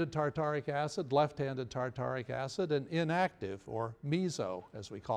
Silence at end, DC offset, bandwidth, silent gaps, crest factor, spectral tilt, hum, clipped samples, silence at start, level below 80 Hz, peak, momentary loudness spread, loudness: 0 s; under 0.1%; 11.5 kHz; none; 18 dB; -6 dB/octave; none; under 0.1%; 0 s; -66 dBFS; -16 dBFS; 9 LU; -35 LUFS